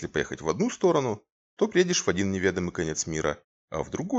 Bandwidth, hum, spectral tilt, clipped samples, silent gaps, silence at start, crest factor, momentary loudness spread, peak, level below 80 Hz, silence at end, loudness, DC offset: 8.2 kHz; none; -4.5 dB/octave; under 0.1%; 1.32-1.57 s, 3.44-3.68 s; 0 s; 18 dB; 10 LU; -8 dBFS; -54 dBFS; 0 s; -27 LUFS; under 0.1%